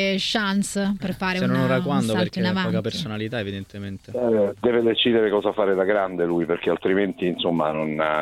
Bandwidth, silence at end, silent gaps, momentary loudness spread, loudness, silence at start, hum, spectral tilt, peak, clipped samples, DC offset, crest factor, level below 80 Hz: 14 kHz; 0 s; none; 8 LU; -22 LUFS; 0 s; none; -5.5 dB/octave; -6 dBFS; under 0.1%; under 0.1%; 16 dB; -54 dBFS